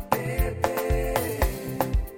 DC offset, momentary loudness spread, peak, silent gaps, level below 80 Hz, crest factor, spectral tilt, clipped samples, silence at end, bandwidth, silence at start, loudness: under 0.1%; 2 LU; -6 dBFS; none; -30 dBFS; 20 dB; -5.5 dB/octave; under 0.1%; 0 s; 17 kHz; 0 s; -27 LUFS